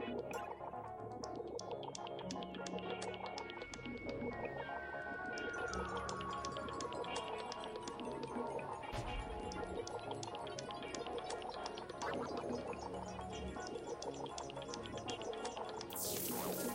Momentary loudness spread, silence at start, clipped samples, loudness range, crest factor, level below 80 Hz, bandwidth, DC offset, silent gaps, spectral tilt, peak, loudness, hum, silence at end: 5 LU; 0 s; under 0.1%; 2 LU; 20 dB; -60 dBFS; 16 kHz; under 0.1%; none; -4 dB/octave; -26 dBFS; -45 LUFS; none; 0 s